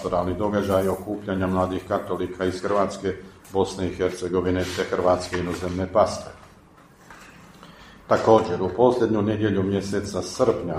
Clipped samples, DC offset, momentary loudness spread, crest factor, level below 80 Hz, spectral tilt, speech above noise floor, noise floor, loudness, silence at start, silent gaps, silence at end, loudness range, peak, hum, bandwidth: under 0.1%; under 0.1%; 9 LU; 20 dB; -50 dBFS; -6 dB/octave; 28 dB; -51 dBFS; -24 LUFS; 0 s; none; 0 s; 4 LU; -2 dBFS; none; 15.5 kHz